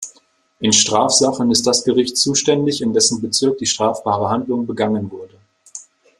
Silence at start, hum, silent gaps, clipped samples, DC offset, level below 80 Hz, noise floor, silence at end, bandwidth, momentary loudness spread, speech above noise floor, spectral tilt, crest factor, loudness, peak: 0 s; none; none; under 0.1%; under 0.1%; -58 dBFS; -55 dBFS; 0.35 s; 13 kHz; 19 LU; 38 dB; -3 dB/octave; 18 dB; -16 LUFS; 0 dBFS